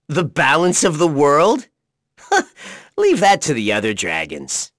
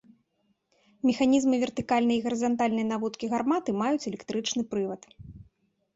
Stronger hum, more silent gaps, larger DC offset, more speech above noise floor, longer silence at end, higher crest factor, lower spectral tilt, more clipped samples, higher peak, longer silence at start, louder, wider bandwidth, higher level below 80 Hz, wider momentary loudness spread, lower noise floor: neither; neither; neither; about the same, 44 dB vs 47 dB; second, 0.1 s vs 0.55 s; about the same, 16 dB vs 16 dB; about the same, -3.5 dB/octave vs -4.5 dB/octave; neither; first, -2 dBFS vs -12 dBFS; second, 0.1 s vs 1.05 s; first, -16 LUFS vs -27 LUFS; first, 11 kHz vs 8 kHz; first, -56 dBFS vs -62 dBFS; about the same, 10 LU vs 8 LU; second, -60 dBFS vs -73 dBFS